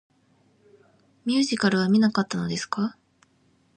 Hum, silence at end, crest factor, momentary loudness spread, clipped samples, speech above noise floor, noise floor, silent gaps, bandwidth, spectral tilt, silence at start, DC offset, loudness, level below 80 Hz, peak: none; 0.85 s; 18 dB; 9 LU; under 0.1%; 41 dB; -64 dBFS; none; 9.4 kHz; -5 dB/octave; 1.25 s; under 0.1%; -24 LUFS; -66 dBFS; -8 dBFS